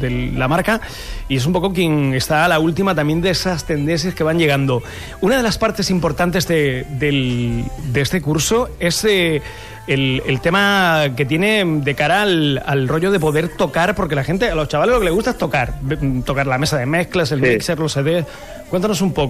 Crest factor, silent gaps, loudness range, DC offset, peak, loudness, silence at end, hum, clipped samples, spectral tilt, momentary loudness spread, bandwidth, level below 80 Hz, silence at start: 14 dB; none; 2 LU; 0.4%; -2 dBFS; -17 LUFS; 0 s; none; under 0.1%; -5 dB/octave; 6 LU; 15.5 kHz; -34 dBFS; 0 s